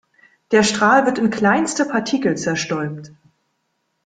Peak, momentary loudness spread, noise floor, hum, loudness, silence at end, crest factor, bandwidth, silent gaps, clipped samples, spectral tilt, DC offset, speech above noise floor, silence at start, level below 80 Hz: -2 dBFS; 10 LU; -71 dBFS; none; -18 LUFS; 0.95 s; 18 dB; 9.6 kHz; none; under 0.1%; -4 dB/octave; under 0.1%; 53 dB; 0.5 s; -58 dBFS